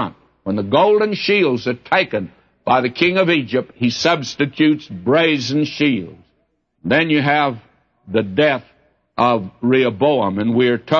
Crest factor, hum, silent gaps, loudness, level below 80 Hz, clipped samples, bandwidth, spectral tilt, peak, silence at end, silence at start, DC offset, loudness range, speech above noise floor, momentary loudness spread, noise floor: 16 dB; none; none; -17 LUFS; -58 dBFS; under 0.1%; 7.2 kHz; -6 dB/octave; -2 dBFS; 0 s; 0 s; under 0.1%; 2 LU; 49 dB; 10 LU; -66 dBFS